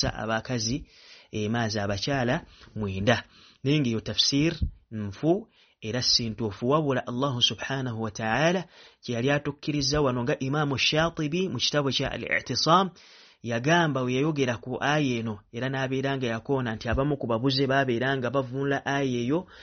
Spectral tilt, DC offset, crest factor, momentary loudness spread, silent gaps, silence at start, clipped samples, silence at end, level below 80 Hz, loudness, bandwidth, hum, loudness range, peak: -3.5 dB/octave; under 0.1%; 20 dB; 10 LU; none; 0 s; under 0.1%; 0 s; -48 dBFS; -26 LUFS; 6.6 kHz; none; 3 LU; -6 dBFS